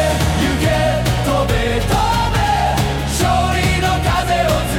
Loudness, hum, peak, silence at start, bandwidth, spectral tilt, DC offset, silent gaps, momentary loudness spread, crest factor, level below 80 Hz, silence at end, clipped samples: -16 LUFS; none; -4 dBFS; 0 s; 18 kHz; -5 dB/octave; under 0.1%; none; 2 LU; 12 dB; -24 dBFS; 0 s; under 0.1%